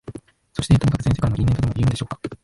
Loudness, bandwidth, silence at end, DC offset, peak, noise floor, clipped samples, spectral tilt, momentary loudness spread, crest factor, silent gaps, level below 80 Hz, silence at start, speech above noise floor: -21 LUFS; 11.5 kHz; 0.1 s; under 0.1%; -4 dBFS; -39 dBFS; under 0.1%; -7 dB/octave; 13 LU; 16 dB; none; -34 dBFS; 0.1 s; 20 dB